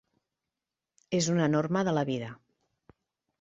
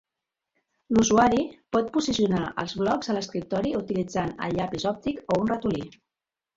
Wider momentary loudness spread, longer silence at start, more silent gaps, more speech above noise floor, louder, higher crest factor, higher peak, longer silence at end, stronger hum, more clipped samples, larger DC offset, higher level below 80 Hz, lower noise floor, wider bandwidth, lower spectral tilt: about the same, 9 LU vs 9 LU; first, 1.1 s vs 0.9 s; neither; about the same, 61 dB vs 64 dB; second, -29 LUFS vs -26 LUFS; about the same, 18 dB vs 20 dB; second, -14 dBFS vs -6 dBFS; first, 1.05 s vs 0.65 s; neither; neither; neither; second, -68 dBFS vs -52 dBFS; about the same, -89 dBFS vs -89 dBFS; about the same, 8 kHz vs 7.8 kHz; about the same, -5.5 dB/octave vs -5 dB/octave